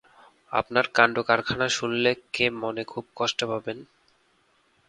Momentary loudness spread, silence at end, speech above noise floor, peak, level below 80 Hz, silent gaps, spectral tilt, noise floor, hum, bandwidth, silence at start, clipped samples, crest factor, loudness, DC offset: 12 LU; 1.05 s; 40 dB; 0 dBFS; -60 dBFS; none; -3.5 dB/octave; -66 dBFS; none; 11 kHz; 0.5 s; under 0.1%; 26 dB; -25 LUFS; under 0.1%